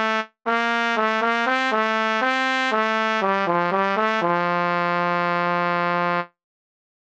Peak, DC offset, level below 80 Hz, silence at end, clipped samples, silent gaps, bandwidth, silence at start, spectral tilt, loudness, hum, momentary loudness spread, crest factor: -6 dBFS; under 0.1%; -76 dBFS; 0.9 s; under 0.1%; none; 9.2 kHz; 0 s; -5 dB/octave; -21 LUFS; none; 2 LU; 16 dB